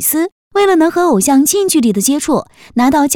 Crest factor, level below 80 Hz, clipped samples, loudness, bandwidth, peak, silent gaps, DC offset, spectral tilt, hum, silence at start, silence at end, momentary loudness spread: 10 dB; -46 dBFS; under 0.1%; -12 LUFS; 19.5 kHz; -2 dBFS; 0.32-0.51 s; under 0.1%; -3.5 dB/octave; none; 0 s; 0 s; 7 LU